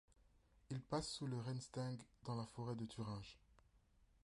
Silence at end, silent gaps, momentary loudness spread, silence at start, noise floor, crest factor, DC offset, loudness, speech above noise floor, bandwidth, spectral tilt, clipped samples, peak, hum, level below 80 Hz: 0.2 s; none; 8 LU; 0.1 s; -74 dBFS; 20 dB; under 0.1%; -48 LUFS; 27 dB; 11.5 kHz; -5.5 dB/octave; under 0.1%; -28 dBFS; none; -70 dBFS